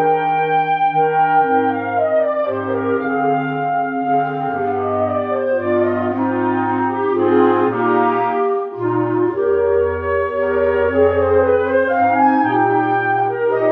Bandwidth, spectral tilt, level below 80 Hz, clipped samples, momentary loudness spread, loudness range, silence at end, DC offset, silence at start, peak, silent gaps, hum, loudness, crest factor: 5 kHz; -10 dB/octave; -48 dBFS; under 0.1%; 5 LU; 3 LU; 0 s; under 0.1%; 0 s; -2 dBFS; none; none; -17 LUFS; 14 dB